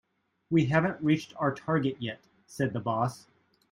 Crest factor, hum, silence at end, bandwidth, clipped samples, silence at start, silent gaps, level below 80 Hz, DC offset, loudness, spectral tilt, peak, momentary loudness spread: 20 dB; none; 0.55 s; 12.5 kHz; under 0.1%; 0.5 s; none; -66 dBFS; under 0.1%; -29 LUFS; -7 dB/octave; -10 dBFS; 12 LU